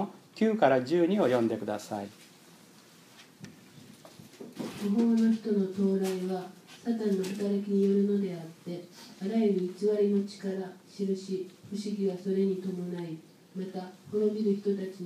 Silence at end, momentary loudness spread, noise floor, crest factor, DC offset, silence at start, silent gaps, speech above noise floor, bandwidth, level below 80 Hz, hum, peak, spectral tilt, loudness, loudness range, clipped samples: 0 s; 16 LU; -56 dBFS; 20 dB; under 0.1%; 0 s; none; 27 dB; 15 kHz; -82 dBFS; none; -10 dBFS; -7 dB/octave; -30 LUFS; 5 LU; under 0.1%